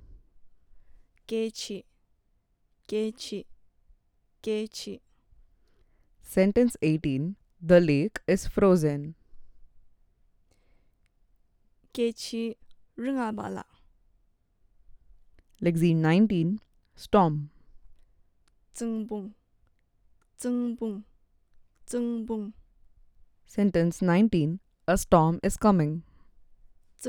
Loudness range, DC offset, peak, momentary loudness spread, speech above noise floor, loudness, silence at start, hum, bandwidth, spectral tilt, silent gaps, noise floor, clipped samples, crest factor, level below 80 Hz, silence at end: 12 LU; under 0.1%; -6 dBFS; 17 LU; 44 dB; -27 LUFS; 0.1 s; none; 17 kHz; -6.5 dB/octave; none; -70 dBFS; under 0.1%; 24 dB; -50 dBFS; 0 s